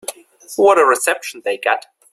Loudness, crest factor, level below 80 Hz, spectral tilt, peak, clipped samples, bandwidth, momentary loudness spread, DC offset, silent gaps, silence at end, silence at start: -16 LUFS; 16 dB; -68 dBFS; -1.5 dB/octave; -2 dBFS; under 0.1%; 15.5 kHz; 14 LU; under 0.1%; none; 0.35 s; 0.1 s